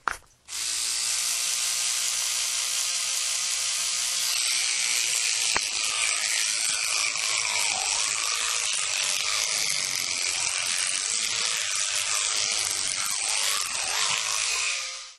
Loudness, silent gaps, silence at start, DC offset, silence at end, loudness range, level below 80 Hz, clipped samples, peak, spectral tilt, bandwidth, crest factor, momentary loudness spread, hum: -24 LUFS; none; 0.05 s; under 0.1%; 0 s; 1 LU; -64 dBFS; under 0.1%; -8 dBFS; 3 dB/octave; 13.5 kHz; 20 dB; 2 LU; none